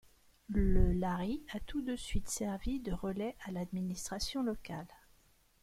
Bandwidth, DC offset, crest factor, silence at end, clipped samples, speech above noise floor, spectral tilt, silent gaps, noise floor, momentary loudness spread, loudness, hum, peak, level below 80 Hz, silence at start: 15.5 kHz; under 0.1%; 20 dB; 0.75 s; under 0.1%; 34 dB; -5.5 dB/octave; none; -68 dBFS; 9 LU; -38 LUFS; none; -16 dBFS; -40 dBFS; 0.5 s